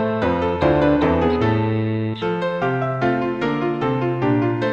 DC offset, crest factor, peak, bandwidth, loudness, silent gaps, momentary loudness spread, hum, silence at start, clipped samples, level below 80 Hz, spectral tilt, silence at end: 0.1%; 14 dB; -4 dBFS; 7.6 kHz; -20 LUFS; none; 5 LU; none; 0 s; under 0.1%; -40 dBFS; -8.5 dB/octave; 0 s